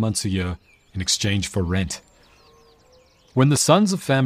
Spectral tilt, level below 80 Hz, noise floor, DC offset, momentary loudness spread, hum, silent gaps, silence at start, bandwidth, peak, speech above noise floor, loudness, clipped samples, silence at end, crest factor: -4.5 dB/octave; -46 dBFS; -55 dBFS; under 0.1%; 14 LU; none; none; 0 s; 15.5 kHz; -2 dBFS; 35 dB; -21 LUFS; under 0.1%; 0 s; 20 dB